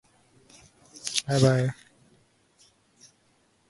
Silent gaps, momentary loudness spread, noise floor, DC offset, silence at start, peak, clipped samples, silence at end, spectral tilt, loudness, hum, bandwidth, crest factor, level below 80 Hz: none; 15 LU; -66 dBFS; under 0.1%; 1.05 s; -4 dBFS; under 0.1%; 1.95 s; -5 dB/octave; -25 LUFS; none; 11.5 kHz; 26 dB; -62 dBFS